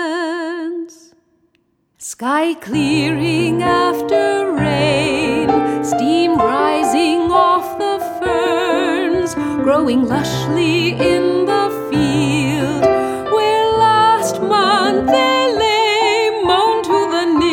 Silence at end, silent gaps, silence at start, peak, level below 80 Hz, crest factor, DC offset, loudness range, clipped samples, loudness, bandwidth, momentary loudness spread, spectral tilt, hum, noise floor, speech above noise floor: 0 s; none; 0 s; 0 dBFS; -44 dBFS; 14 dB; under 0.1%; 4 LU; under 0.1%; -15 LUFS; 17.5 kHz; 6 LU; -5 dB/octave; none; -62 dBFS; 47 dB